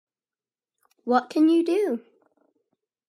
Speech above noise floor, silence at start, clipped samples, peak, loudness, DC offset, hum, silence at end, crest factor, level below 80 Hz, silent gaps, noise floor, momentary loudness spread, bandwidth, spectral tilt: over 68 dB; 1.05 s; under 0.1%; -8 dBFS; -23 LUFS; under 0.1%; none; 1.1 s; 18 dB; -80 dBFS; none; under -90 dBFS; 13 LU; 12 kHz; -5 dB/octave